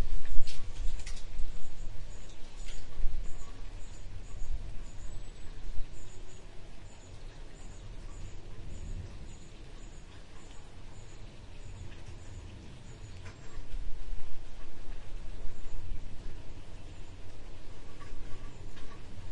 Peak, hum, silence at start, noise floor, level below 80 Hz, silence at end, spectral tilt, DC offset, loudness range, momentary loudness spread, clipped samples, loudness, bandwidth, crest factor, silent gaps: -6 dBFS; none; 0 s; -45 dBFS; -40 dBFS; 0 s; -5 dB/octave; under 0.1%; 4 LU; 9 LU; under 0.1%; -48 LUFS; 8.4 kHz; 20 dB; none